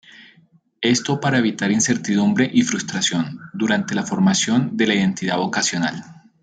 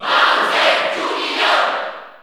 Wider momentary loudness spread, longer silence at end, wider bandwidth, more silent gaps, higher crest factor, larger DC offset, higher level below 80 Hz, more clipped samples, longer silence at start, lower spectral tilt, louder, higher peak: about the same, 6 LU vs 7 LU; first, 0.3 s vs 0.1 s; second, 9.4 kHz vs over 20 kHz; neither; about the same, 16 dB vs 16 dB; neither; first, -62 dBFS vs -74 dBFS; neither; first, 0.2 s vs 0 s; first, -4 dB/octave vs -1 dB/octave; second, -19 LUFS vs -15 LUFS; about the same, -4 dBFS vs -2 dBFS